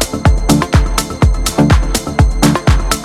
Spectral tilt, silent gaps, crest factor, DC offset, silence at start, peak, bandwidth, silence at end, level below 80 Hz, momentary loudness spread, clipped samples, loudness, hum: -5 dB/octave; none; 12 dB; under 0.1%; 0 s; 0 dBFS; 16 kHz; 0 s; -16 dBFS; 3 LU; under 0.1%; -13 LUFS; none